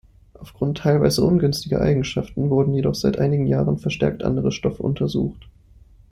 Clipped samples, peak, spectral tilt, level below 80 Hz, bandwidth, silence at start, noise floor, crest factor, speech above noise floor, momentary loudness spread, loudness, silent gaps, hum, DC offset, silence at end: under 0.1%; -4 dBFS; -7 dB/octave; -42 dBFS; 15 kHz; 0.4 s; -49 dBFS; 18 dB; 29 dB; 6 LU; -21 LUFS; none; none; under 0.1%; 0.6 s